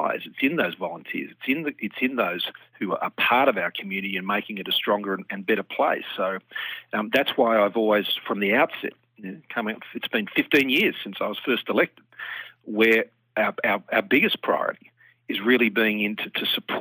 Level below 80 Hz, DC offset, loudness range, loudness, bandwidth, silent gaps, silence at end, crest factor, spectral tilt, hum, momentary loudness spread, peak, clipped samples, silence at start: -80 dBFS; under 0.1%; 2 LU; -24 LUFS; over 20 kHz; none; 0 s; 20 dB; -5.5 dB/octave; none; 12 LU; -4 dBFS; under 0.1%; 0 s